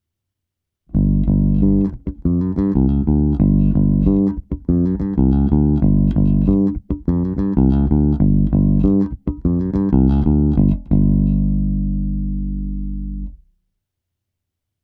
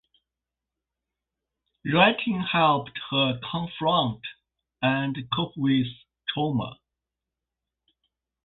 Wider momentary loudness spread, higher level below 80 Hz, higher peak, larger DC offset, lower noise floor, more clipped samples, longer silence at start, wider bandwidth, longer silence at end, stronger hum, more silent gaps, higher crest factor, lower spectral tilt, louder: second, 9 LU vs 13 LU; first, -22 dBFS vs -60 dBFS; first, 0 dBFS vs -4 dBFS; neither; second, -81 dBFS vs -88 dBFS; neither; second, 0.9 s vs 1.85 s; second, 3.4 kHz vs 4.3 kHz; second, 1.5 s vs 1.7 s; neither; neither; second, 16 dB vs 24 dB; first, -13 dB/octave vs -10 dB/octave; first, -17 LUFS vs -25 LUFS